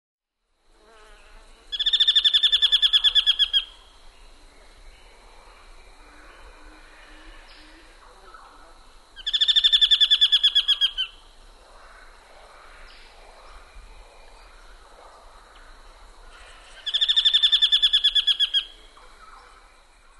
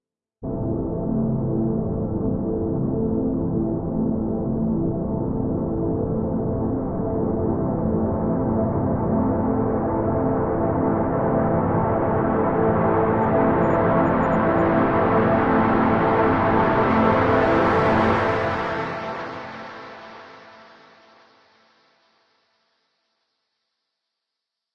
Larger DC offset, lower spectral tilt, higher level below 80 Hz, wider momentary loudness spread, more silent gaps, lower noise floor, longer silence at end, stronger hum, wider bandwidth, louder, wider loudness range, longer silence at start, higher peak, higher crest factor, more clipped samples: neither; second, 1.5 dB/octave vs -9.5 dB/octave; second, -50 dBFS vs -40 dBFS; first, 12 LU vs 8 LU; neither; second, -70 dBFS vs -83 dBFS; second, 1.5 s vs 4.2 s; neither; first, 12 kHz vs 6.8 kHz; first, -17 LUFS vs -21 LUFS; first, 10 LU vs 6 LU; first, 1.7 s vs 0.4 s; about the same, -6 dBFS vs -4 dBFS; about the same, 18 dB vs 16 dB; neither